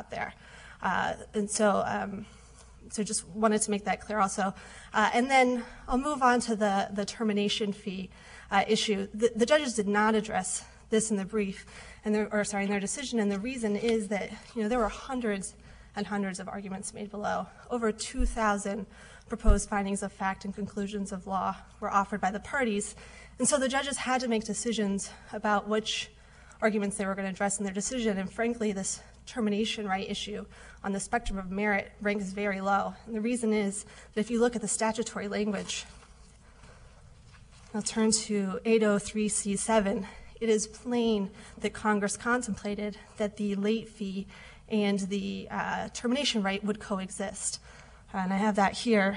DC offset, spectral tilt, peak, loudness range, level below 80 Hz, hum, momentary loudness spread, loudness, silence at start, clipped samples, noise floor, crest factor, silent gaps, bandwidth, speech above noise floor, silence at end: under 0.1%; -4 dB/octave; -8 dBFS; 5 LU; -44 dBFS; none; 12 LU; -30 LUFS; 0 s; under 0.1%; -54 dBFS; 22 dB; none; 10.5 kHz; 25 dB; 0 s